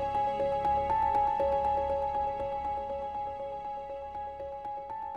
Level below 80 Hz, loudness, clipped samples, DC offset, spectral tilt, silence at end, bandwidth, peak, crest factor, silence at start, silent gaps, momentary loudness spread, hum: -50 dBFS; -32 LUFS; under 0.1%; under 0.1%; -7 dB/octave; 0 s; 7.6 kHz; -18 dBFS; 14 dB; 0 s; none; 11 LU; none